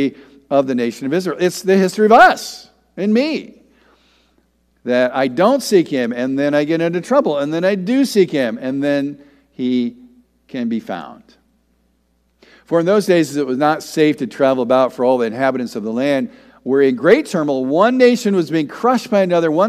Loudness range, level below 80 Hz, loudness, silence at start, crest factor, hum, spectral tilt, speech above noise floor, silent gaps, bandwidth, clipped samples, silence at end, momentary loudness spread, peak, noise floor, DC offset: 7 LU; -60 dBFS; -16 LUFS; 0 s; 16 dB; none; -5.5 dB/octave; 46 dB; none; 15 kHz; under 0.1%; 0 s; 11 LU; 0 dBFS; -61 dBFS; under 0.1%